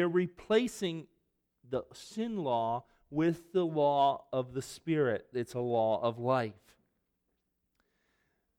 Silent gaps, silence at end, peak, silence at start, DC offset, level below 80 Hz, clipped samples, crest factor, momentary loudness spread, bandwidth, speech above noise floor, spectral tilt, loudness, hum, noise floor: none; 2.05 s; -16 dBFS; 0 s; under 0.1%; -70 dBFS; under 0.1%; 18 dB; 10 LU; 16 kHz; 50 dB; -6 dB/octave; -33 LUFS; none; -81 dBFS